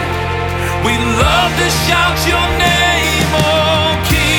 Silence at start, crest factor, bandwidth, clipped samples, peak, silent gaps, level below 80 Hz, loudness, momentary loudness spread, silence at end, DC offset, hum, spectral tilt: 0 s; 12 dB; 19.5 kHz; under 0.1%; 0 dBFS; none; -24 dBFS; -12 LUFS; 6 LU; 0 s; under 0.1%; none; -4 dB/octave